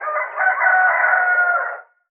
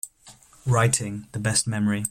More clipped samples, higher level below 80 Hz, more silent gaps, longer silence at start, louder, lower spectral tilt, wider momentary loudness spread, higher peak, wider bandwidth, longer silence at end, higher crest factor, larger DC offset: neither; second, under -90 dBFS vs -54 dBFS; neither; about the same, 0 s vs 0.05 s; first, -16 LUFS vs -24 LUFS; second, 5.5 dB/octave vs -4 dB/octave; second, 10 LU vs 13 LU; first, -2 dBFS vs -6 dBFS; second, 3.2 kHz vs 16 kHz; first, 0.3 s vs 0 s; second, 14 dB vs 20 dB; neither